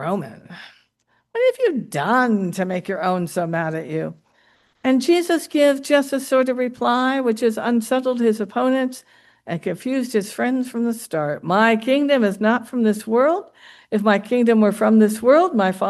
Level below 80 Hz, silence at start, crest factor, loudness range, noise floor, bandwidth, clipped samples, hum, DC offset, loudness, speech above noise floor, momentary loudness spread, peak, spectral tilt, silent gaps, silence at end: -68 dBFS; 0 s; 18 dB; 4 LU; -66 dBFS; 12.5 kHz; under 0.1%; none; under 0.1%; -19 LUFS; 47 dB; 10 LU; -2 dBFS; -5.5 dB/octave; none; 0 s